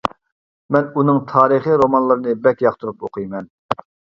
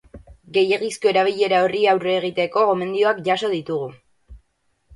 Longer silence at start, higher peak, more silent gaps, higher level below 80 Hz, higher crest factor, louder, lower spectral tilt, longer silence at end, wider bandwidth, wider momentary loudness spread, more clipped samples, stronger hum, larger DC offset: about the same, 0.05 s vs 0.15 s; first, 0 dBFS vs -4 dBFS; first, 0.32-0.69 s, 3.50-3.69 s vs none; about the same, -56 dBFS vs -54 dBFS; about the same, 18 dB vs 16 dB; first, -17 LUFS vs -20 LUFS; first, -8.5 dB/octave vs -4.5 dB/octave; second, 0.4 s vs 0.6 s; second, 7.4 kHz vs 11.5 kHz; first, 13 LU vs 7 LU; neither; neither; neither